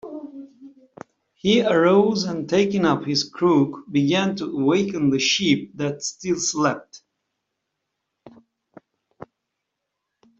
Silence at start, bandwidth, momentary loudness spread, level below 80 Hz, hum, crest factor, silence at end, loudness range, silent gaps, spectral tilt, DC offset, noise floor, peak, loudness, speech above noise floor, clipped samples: 0.05 s; 8.2 kHz; 11 LU; -62 dBFS; none; 18 dB; 1.15 s; 9 LU; none; -4.5 dB/octave; under 0.1%; -80 dBFS; -4 dBFS; -20 LUFS; 60 dB; under 0.1%